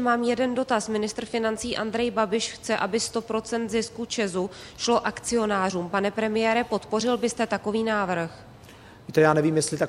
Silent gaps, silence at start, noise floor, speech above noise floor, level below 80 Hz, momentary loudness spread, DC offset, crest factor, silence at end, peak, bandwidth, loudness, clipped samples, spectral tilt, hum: none; 0 s; -47 dBFS; 22 dB; -56 dBFS; 6 LU; under 0.1%; 20 dB; 0 s; -6 dBFS; 14.5 kHz; -25 LUFS; under 0.1%; -4 dB/octave; none